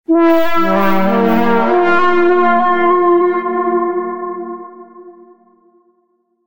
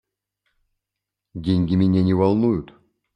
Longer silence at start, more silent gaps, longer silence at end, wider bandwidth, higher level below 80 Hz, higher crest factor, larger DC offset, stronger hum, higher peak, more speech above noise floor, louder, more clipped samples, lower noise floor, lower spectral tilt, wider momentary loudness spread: second, 0 s vs 1.35 s; neither; second, 0 s vs 0.5 s; first, 16 kHz vs 5.6 kHz; about the same, -50 dBFS vs -52 dBFS; second, 12 dB vs 18 dB; neither; second, none vs 50 Hz at -45 dBFS; about the same, -2 dBFS vs -4 dBFS; second, 50 dB vs 66 dB; first, -13 LUFS vs -20 LUFS; neither; second, -61 dBFS vs -84 dBFS; second, -7.5 dB/octave vs -10 dB/octave; about the same, 12 LU vs 11 LU